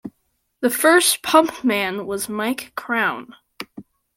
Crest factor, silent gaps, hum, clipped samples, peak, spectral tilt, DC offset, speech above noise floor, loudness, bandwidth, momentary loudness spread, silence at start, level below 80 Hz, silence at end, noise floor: 20 dB; none; none; under 0.1%; -2 dBFS; -2 dB/octave; under 0.1%; 51 dB; -19 LUFS; 16.5 kHz; 22 LU; 0.05 s; -62 dBFS; 0.35 s; -70 dBFS